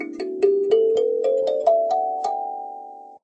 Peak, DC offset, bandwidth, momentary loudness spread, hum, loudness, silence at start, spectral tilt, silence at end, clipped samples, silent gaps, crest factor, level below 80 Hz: -6 dBFS; under 0.1%; 8.4 kHz; 15 LU; none; -21 LUFS; 0 s; -4.5 dB/octave; 0.05 s; under 0.1%; none; 16 dB; -76 dBFS